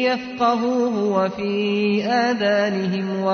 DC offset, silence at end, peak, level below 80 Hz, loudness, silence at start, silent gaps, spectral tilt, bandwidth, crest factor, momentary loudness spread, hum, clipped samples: under 0.1%; 0 s; -8 dBFS; -62 dBFS; -20 LUFS; 0 s; none; -6 dB/octave; 6.6 kHz; 12 dB; 4 LU; none; under 0.1%